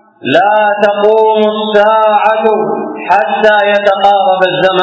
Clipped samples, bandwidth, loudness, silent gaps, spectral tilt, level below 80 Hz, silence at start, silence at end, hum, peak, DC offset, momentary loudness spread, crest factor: 1%; 8 kHz; -9 LUFS; none; -5.5 dB/octave; -56 dBFS; 0.25 s; 0 s; none; 0 dBFS; under 0.1%; 4 LU; 10 dB